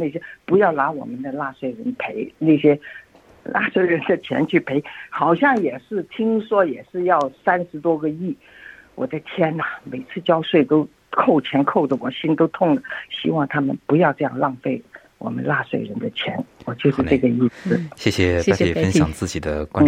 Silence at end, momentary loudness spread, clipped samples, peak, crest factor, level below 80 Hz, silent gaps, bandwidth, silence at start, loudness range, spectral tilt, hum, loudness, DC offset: 0 s; 11 LU; under 0.1%; -2 dBFS; 18 dB; -50 dBFS; none; 13 kHz; 0 s; 3 LU; -6.5 dB/octave; none; -20 LUFS; under 0.1%